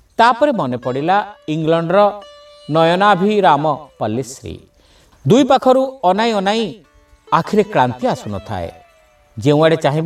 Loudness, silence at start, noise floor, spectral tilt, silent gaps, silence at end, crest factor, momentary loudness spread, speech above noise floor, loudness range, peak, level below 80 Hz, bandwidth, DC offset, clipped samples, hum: -15 LUFS; 0.2 s; -51 dBFS; -6 dB/octave; none; 0 s; 16 dB; 13 LU; 36 dB; 3 LU; 0 dBFS; -52 dBFS; 13.5 kHz; under 0.1%; under 0.1%; none